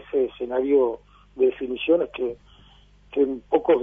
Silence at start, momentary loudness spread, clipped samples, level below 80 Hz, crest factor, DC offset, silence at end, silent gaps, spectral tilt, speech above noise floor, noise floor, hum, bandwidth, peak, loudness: 0.1 s; 10 LU; under 0.1%; -56 dBFS; 18 dB; under 0.1%; 0 s; none; -7.5 dB/octave; 31 dB; -53 dBFS; 50 Hz at -55 dBFS; 3.7 kHz; -6 dBFS; -24 LUFS